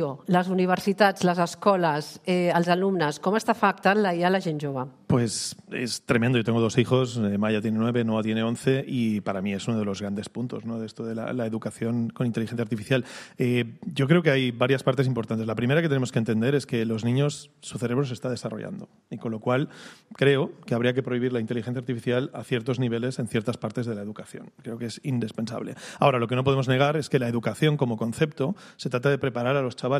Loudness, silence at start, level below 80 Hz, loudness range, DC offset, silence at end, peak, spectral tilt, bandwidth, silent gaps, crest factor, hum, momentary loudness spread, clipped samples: -25 LUFS; 0 s; -64 dBFS; 6 LU; under 0.1%; 0 s; -6 dBFS; -6 dB/octave; 14.5 kHz; none; 20 dB; none; 11 LU; under 0.1%